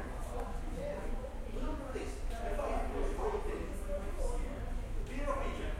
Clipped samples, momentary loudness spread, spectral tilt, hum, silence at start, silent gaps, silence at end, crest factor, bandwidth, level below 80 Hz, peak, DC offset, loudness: under 0.1%; 5 LU; -6 dB/octave; none; 0 s; none; 0 s; 16 dB; 13.5 kHz; -38 dBFS; -20 dBFS; under 0.1%; -40 LUFS